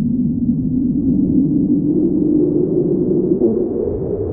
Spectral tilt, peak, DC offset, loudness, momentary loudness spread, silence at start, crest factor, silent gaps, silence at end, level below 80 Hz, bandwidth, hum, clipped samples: -17 dB/octave; -4 dBFS; under 0.1%; -16 LUFS; 4 LU; 0 s; 12 dB; none; 0 s; -36 dBFS; 1.5 kHz; none; under 0.1%